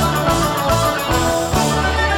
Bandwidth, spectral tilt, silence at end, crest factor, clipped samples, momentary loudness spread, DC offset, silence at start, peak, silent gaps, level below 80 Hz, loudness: 19.5 kHz; -4 dB/octave; 0 s; 12 dB; under 0.1%; 1 LU; under 0.1%; 0 s; -4 dBFS; none; -28 dBFS; -17 LUFS